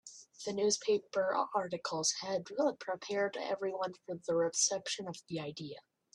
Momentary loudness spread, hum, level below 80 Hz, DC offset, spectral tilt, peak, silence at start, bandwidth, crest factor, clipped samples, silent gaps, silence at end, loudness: 12 LU; none; -80 dBFS; under 0.1%; -2.5 dB/octave; -18 dBFS; 0.05 s; 12 kHz; 18 dB; under 0.1%; none; 0.35 s; -35 LUFS